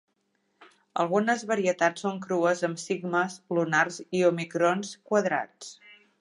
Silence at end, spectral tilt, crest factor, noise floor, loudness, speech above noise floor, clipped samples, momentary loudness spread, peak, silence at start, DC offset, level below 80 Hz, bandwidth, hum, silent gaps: 0.25 s; -5 dB/octave; 20 dB; -74 dBFS; -27 LUFS; 47 dB; under 0.1%; 8 LU; -8 dBFS; 0.95 s; under 0.1%; -80 dBFS; 11.5 kHz; none; none